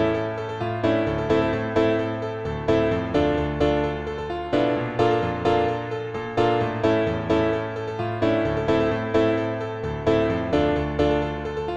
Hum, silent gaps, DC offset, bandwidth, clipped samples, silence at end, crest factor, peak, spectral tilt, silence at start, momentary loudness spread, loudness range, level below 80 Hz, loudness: none; none; under 0.1%; 8.4 kHz; under 0.1%; 0 s; 16 dB; -8 dBFS; -7.5 dB/octave; 0 s; 7 LU; 1 LU; -40 dBFS; -23 LUFS